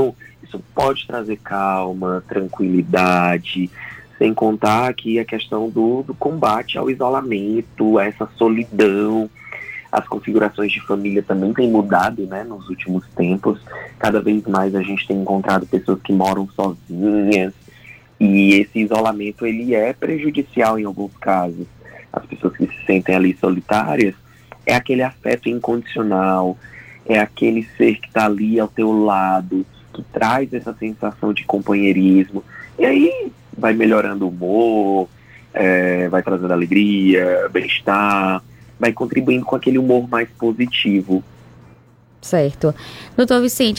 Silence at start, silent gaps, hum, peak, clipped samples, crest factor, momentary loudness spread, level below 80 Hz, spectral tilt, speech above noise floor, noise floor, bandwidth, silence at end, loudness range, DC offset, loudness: 0 s; none; none; 0 dBFS; under 0.1%; 18 dB; 10 LU; -52 dBFS; -6 dB/octave; 31 dB; -48 dBFS; 16.5 kHz; 0 s; 3 LU; under 0.1%; -18 LUFS